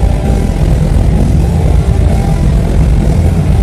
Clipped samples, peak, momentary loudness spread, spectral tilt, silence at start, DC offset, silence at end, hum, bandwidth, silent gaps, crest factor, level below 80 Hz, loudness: 0.3%; 0 dBFS; 2 LU; -8 dB/octave; 0 s; under 0.1%; 0 s; none; 13 kHz; none; 8 dB; -12 dBFS; -11 LUFS